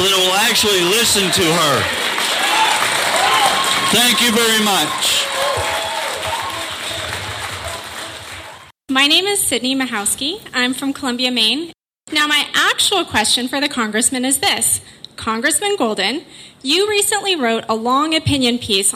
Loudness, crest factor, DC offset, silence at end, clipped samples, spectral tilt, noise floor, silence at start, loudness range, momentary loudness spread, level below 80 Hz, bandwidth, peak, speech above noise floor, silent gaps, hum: -15 LUFS; 16 dB; under 0.1%; 0 s; under 0.1%; -1.5 dB/octave; -37 dBFS; 0 s; 5 LU; 11 LU; -48 dBFS; 16 kHz; -2 dBFS; 21 dB; none; none